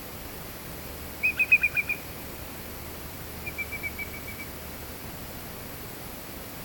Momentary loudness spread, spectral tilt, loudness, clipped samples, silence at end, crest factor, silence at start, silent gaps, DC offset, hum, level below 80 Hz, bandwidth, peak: 17 LU; -3 dB/octave; -30 LUFS; under 0.1%; 0 s; 24 dB; 0 s; none; under 0.1%; none; -48 dBFS; 17.5 kHz; -10 dBFS